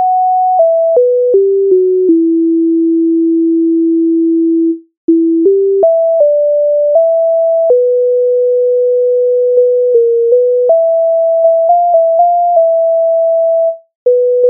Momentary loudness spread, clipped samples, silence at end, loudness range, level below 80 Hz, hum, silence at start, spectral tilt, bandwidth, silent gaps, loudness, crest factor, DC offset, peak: 2 LU; under 0.1%; 0 s; 1 LU; -72 dBFS; none; 0 s; -6 dB/octave; 1.1 kHz; 4.97-5.08 s, 13.95-14.06 s; -10 LUFS; 8 dB; under 0.1%; 0 dBFS